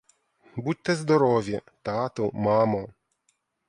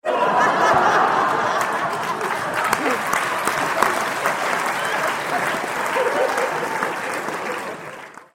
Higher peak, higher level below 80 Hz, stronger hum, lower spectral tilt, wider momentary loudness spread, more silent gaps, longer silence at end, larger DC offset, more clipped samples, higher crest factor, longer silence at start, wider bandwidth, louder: second, -8 dBFS vs 0 dBFS; about the same, -60 dBFS vs -60 dBFS; neither; first, -6.5 dB/octave vs -3 dB/octave; first, 12 LU vs 9 LU; neither; first, 0.8 s vs 0.1 s; neither; neither; about the same, 18 dB vs 20 dB; first, 0.55 s vs 0.05 s; second, 11 kHz vs 16.5 kHz; second, -25 LUFS vs -20 LUFS